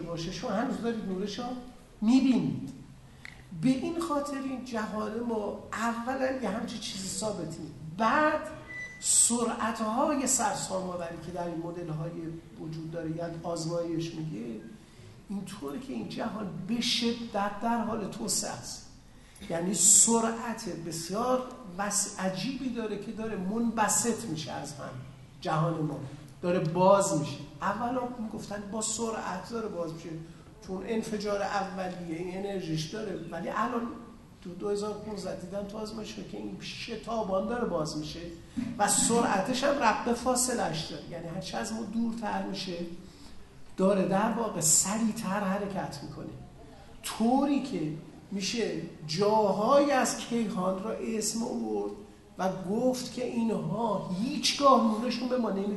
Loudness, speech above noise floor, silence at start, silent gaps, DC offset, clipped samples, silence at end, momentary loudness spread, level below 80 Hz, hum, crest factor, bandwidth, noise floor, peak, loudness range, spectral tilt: -30 LUFS; 22 dB; 0 s; none; under 0.1%; under 0.1%; 0 s; 16 LU; -58 dBFS; none; 22 dB; 12.5 kHz; -52 dBFS; -8 dBFS; 9 LU; -3.5 dB/octave